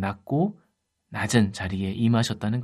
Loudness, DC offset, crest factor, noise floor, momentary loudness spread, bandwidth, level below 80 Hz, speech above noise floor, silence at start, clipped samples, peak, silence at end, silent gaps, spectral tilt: -25 LUFS; under 0.1%; 18 dB; -72 dBFS; 7 LU; 14 kHz; -58 dBFS; 47 dB; 0 s; under 0.1%; -8 dBFS; 0 s; none; -6 dB/octave